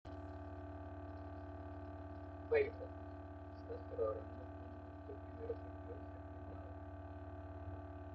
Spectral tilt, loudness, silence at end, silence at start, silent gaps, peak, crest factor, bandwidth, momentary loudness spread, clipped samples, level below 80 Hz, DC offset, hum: -7 dB/octave; -47 LUFS; 0 s; 0.05 s; none; -22 dBFS; 24 dB; 5.6 kHz; 10 LU; under 0.1%; -60 dBFS; under 0.1%; none